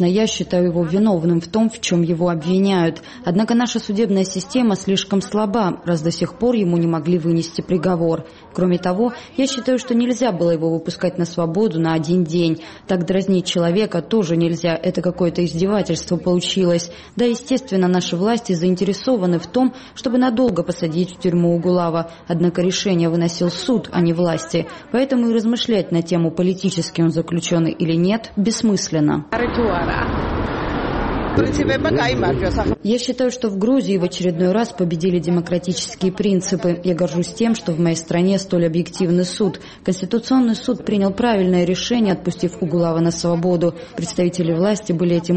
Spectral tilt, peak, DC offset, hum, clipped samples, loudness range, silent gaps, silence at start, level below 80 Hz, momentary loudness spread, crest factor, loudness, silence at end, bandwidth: -6 dB/octave; -4 dBFS; 0.1%; none; under 0.1%; 1 LU; none; 0 s; -40 dBFS; 4 LU; 14 dB; -19 LUFS; 0 s; 8.8 kHz